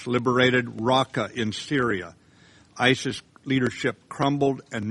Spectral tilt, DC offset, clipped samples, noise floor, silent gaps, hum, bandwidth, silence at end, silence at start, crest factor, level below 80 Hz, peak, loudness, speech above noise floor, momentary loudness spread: -5 dB/octave; under 0.1%; under 0.1%; -55 dBFS; none; none; 11.5 kHz; 0 s; 0 s; 22 dB; -60 dBFS; -4 dBFS; -24 LUFS; 31 dB; 10 LU